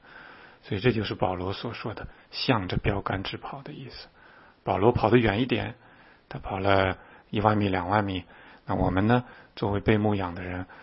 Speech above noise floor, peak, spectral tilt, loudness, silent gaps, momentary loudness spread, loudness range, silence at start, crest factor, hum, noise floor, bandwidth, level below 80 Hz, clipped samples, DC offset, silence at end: 28 dB; -4 dBFS; -10.5 dB/octave; -27 LUFS; none; 17 LU; 5 LU; 0.1 s; 24 dB; none; -54 dBFS; 5.8 kHz; -46 dBFS; under 0.1%; under 0.1%; 0 s